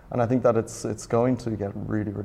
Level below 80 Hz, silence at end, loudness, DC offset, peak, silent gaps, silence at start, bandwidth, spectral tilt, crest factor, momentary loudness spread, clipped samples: -50 dBFS; 0 s; -25 LUFS; under 0.1%; -8 dBFS; none; 0.05 s; 14 kHz; -7 dB/octave; 16 dB; 9 LU; under 0.1%